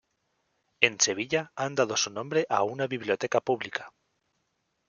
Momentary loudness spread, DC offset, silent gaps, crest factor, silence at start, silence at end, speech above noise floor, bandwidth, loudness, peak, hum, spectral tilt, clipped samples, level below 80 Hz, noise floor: 8 LU; under 0.1%; none; 28 dB; 0.8 s; 1 s; 49 dB; 10 kHz; -27 LUFS; -2 dBFS; none; -2.5 dB/octave; under 0.1%; -74 dBFS; -77 dBFS